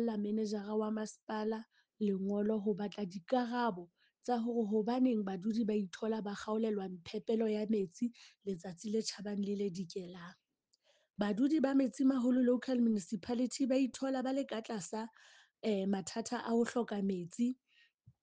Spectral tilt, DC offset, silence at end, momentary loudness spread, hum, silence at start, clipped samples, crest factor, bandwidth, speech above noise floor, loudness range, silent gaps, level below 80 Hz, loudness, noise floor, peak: -6 dB/octave; under 0.1%; 0.1 s; 11 LU; none; 0 s; under 0.1%; 16 dB; 9.6 kHz; 42 dB; 5 LU; 1.23-1.27 s, 17.94-17.98 s; -78 dBFS; -36 LUFS; -78 dBFS; -20 dBFS